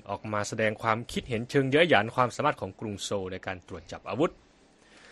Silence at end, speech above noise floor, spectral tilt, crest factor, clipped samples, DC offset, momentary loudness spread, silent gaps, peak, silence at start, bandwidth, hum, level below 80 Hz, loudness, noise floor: 0 s; 31 dB; -5 dB/octave; 24 dB; under 0.1%; under 0.1%; 14 LU; none; -6 dBFS; 0.05 s; 12 kHz; none; -58 dBFS; -28 LUFS; -59 dBFS